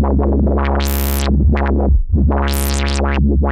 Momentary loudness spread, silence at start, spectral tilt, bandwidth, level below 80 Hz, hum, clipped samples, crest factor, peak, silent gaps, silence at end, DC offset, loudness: 2 LU; 0 s; -6 dB/octave; 16.5 kHz; -16 dBFS; none; under 0.1%; 14 dB; 0 dBFS; none; 0 s; under 0.1%; -16 LUFS